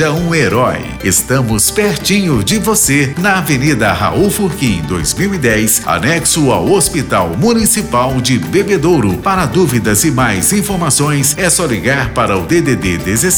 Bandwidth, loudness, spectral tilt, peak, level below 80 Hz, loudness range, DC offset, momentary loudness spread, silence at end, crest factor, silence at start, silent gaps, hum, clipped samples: over 20 kHz; -12 LUFS; -4 dB/octave; -2 dBFS; -32 dBFS; 1 LU; under 0.1%; 4 LU; 0 s; 10 dB; 0 s; none; none; under 0.1%